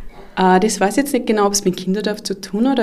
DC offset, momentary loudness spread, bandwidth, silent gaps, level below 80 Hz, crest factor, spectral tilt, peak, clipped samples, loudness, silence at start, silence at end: under 0.1%; 9 LU; 15.5 kHz; none; -44 dBFS; 14 dB; -4.5 dB/octave; -2 dBFS; under 0.1%; -17 LUFS; 0 s; 0 s